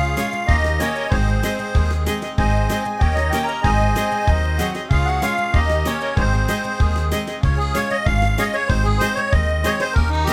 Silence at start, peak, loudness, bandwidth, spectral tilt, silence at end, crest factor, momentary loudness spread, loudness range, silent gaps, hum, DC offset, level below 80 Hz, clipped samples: 0 s; -2 dBFS; -19 LUFS; 16.5 kHz; -5.5 dB/octave; 0 s; 16 dB; 3 LU; 1 LU; none; none; under 0.1%; -22 dBFS; under 0.1%